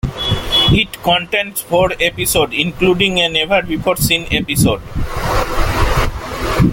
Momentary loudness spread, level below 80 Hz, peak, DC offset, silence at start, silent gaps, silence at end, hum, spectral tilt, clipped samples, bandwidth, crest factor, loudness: 6 LU; -24 dBFS; 0 dBFS; under 0.1%; 0.05 s; none; 0 s; none; -4 dB/octave; under 0.1%; 17 kHz; 16 dB; -15 LUFS